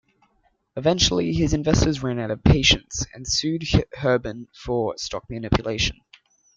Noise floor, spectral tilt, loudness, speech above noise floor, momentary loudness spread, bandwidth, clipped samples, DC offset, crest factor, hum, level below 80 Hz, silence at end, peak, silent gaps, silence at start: -66 dBFS; -4.5 dB/octave; -22 LUFS; 44 dB; 12 LU; 9.2 kHz; under 0.1%; under 0.1%; 20 dB; none; -34 dBFS; 0.65 s; -2 dBFS; none; 0.75 s